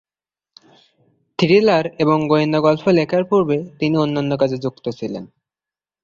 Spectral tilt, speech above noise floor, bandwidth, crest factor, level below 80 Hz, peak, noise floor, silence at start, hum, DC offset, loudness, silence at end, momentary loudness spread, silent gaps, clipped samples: -7.5 dB/octave; over 73 dB; 7.4 kHz; 16 dB; -58 dBFS; -2 dBFS; under -90 dBFS; 1.4 s; none; under 0.1%; -17 LUFS; 0.75 s; 13 LU; none; under 0.1%